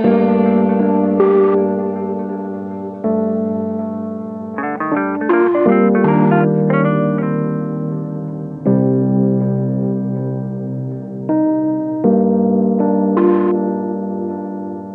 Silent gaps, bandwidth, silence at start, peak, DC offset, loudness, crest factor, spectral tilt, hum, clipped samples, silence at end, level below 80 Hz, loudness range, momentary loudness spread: none; 4.2 kHz; 0 s; -2 dBFS; under 0.1%; -16 LUFS; 14 dB; -11.5 dB/octave; none; under 0.1%; 0 s; -58 dBFS; 4 LU; 11 LU